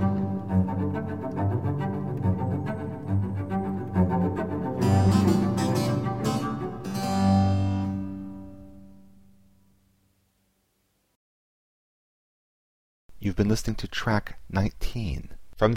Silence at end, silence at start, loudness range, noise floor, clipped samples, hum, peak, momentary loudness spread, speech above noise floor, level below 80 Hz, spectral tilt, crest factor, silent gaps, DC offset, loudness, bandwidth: 0 s; 0 s; 9 LU; -72 dBFS; under 0.1%; none; -8 dBFS; 11 LU; 45 dB; -44 dBFS; -7 dB/octave; 20 dB; 11.16-13.09 s; 0.3%; -27 LUFS; 15.5 kHz